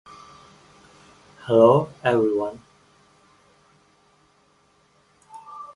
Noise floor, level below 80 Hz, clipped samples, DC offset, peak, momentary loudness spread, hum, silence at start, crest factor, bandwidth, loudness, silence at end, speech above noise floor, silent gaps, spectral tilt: -61 dBFS; -64 dBFS; under 0.1%; under 0.1%; -4 dBFS; 30 LU; none; 1.45 s; 22 dB; 11 kHz; -20 LUFS; 0.1 s; 43 dB; none; -7.5 dB/octave